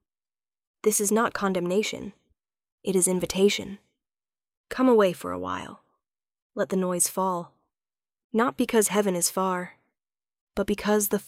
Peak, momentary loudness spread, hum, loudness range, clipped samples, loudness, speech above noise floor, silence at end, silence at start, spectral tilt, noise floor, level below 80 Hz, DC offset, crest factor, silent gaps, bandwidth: -8 dBFS; 14 LU; none; 3 LU; under 0.1%; -25 LUFS; over 65 dB; 0.05 s; 0.85 s; -4 dB/octave; under -90 dBFS; -58 dBFS; under 0.1%; 20 dB; 2.72-2.78 s, 4.57-4.64 s, 6.42-6.50 s, 8.24-8.30 s, 10.41-10.47 s; 16 kHz